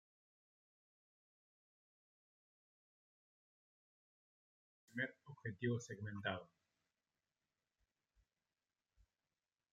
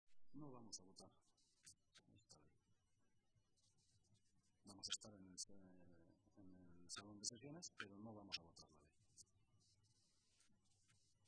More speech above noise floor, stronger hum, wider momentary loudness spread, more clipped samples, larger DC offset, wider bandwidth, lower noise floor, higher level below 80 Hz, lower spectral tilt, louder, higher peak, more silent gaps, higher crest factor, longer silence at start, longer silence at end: first, over 45 dB vs 26 dB; neither; second, 9 LU vs 18 LU; neither; neither; second, 7.4 kHz vs 9.6 kHz; first, under -90 dBFS vs -84 dBFS; about the same, -88 dBFS vs -86 dBFS; first, -5 dB/octave vs -2 dB/octave; first, -46 LUFS vs -55 LUFS; first, -26 dBFS vs -32 dBFS; neither; about the same, 28 dB vs 30 dB; first, 4.95 s vs 0.05 s; first, 3.3 s vs 0 s